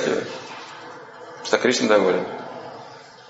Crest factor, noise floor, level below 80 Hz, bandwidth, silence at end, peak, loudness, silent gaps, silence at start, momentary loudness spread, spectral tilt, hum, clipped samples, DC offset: 22 dB; -42 dBFS; -70 dBFS; 8 kHz; 0 s; -2 dBFS; -21 LUFS; none; 0 s; 22 LU; -3.5 dB/octave; none; under 0.1%; under 0.1%